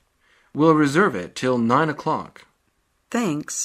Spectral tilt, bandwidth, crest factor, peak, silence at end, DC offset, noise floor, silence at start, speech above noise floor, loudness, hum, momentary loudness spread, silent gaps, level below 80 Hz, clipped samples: -5 dB/octave; 15 kHz; 18 dB; -4 dBFS; 0 s; under 0.1%; -68 dBFS; 0.55 s; 48 dB; -21 LUFS; none; 11 LU; none; -64 dBFS; under 0.1%